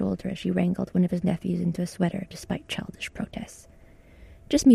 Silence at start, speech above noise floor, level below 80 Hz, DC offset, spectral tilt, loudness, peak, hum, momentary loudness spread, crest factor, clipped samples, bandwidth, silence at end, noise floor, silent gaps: 0 s; 24 dB; -50 dBFS; under 0.1%; -6 dB/octave; -28 LUFS; -8 dBFS; none; 11 LU; 18 dB; under 0.1%; 13.5 kHz; 0 s; -51 dBFS; none